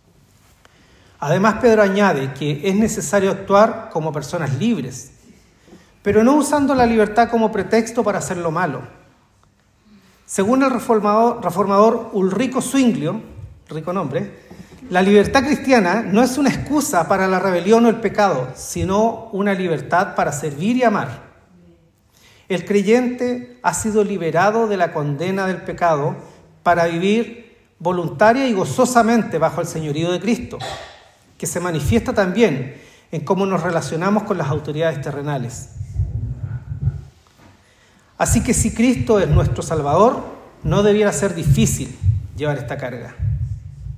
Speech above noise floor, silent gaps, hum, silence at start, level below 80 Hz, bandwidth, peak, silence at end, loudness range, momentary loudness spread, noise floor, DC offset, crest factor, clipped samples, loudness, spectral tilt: 39 dB; none; none; 1.2 s; -36 dBFS; 16 kHz; 0 dBFS; 0 s; 5 LU; 12 LU; -56 dBFS; under 0.1%; 18 dB; under 0.1%; -18 LUFS; -5.5 dB/octave